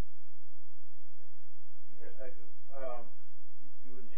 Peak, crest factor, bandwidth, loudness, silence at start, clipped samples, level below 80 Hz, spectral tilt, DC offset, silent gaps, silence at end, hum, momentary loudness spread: -20 dBFS; 20 dB; 3.4 kHz; -49 LUFS; 0 s; under 0.1%; -64 dBFS; -9 dB/octave; 8%; none; 0 s; none; 18 LU